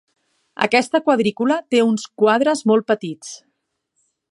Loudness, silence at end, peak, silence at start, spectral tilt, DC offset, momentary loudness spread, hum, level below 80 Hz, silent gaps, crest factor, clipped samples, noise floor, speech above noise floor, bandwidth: -18 LUFS; 0.95 s; 0 dBFS; 0.6 s; -4.5 dB/octave; under 0.1%; 17 LU; none; -70 dBFS; none; 20 dB; under 0.1%; -72 dBFS; 55 dB; 11.5 kHz